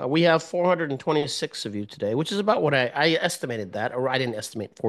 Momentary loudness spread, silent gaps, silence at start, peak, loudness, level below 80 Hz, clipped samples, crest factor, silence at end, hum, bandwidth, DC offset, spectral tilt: 9 LU; none; 0 s; -6 dBFS; -24 LUFS; -70 dBFS; under 0.1%; 20 dB; 0 s; none; 12.5 kHz; under 0.1%; -4.5 dB/octave